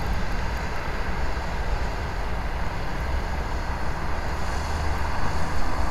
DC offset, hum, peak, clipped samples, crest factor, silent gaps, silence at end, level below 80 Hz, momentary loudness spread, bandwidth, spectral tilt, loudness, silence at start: under 0.1%; none; -10 dBFS; under 0.1%; 14 dB; none; 0 s; -28 dBFS; 2 LU; 13.5 kHz; -5.5 dB/octave; -30 LUFS; 0 s